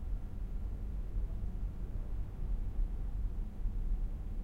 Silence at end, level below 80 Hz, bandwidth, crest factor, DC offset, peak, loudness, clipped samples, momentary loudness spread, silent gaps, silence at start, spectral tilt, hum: 0 s; -36 dBFS; 3.1 kHz; 12 dB; under 0.1%; -24 dBFS; -43 LUFS; under 0.1%; 3 LU; none; 0 s; -9 dB/octave; none